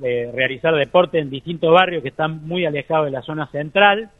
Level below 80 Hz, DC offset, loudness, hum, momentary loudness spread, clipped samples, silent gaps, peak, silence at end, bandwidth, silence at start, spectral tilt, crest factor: -54 dBFS; under 0.1%; -18 LUFS; none; 10 LU; under 0.1%; none; 0 dBFS; 0.1 s; 4 kHz; 0 s; -7.5 dB/octave; 18 dB